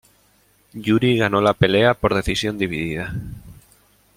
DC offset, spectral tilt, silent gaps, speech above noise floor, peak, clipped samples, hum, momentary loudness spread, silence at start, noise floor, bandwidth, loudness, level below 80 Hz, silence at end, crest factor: under 0.1%; -6 dB/octave; none; 40 dB; -2 dBFS; under 0.1%; none; 16 LU; 0.75 s; -58 dBFS; 16 kHz; -19 LUFS; -42 dBFS; 0.65 s; 20 dB